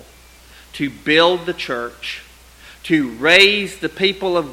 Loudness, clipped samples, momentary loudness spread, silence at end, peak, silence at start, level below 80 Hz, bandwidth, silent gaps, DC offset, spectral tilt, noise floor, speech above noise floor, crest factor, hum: -16 LUFS; under 0.1%; 19 LU; 0 s; 0 dBFS; 0.75 s; -48 dBFS; 16.5 kHz; none; under 0.1%; -3.5 dB/octave; -45 dBFS; 28 dB; 18 dB; none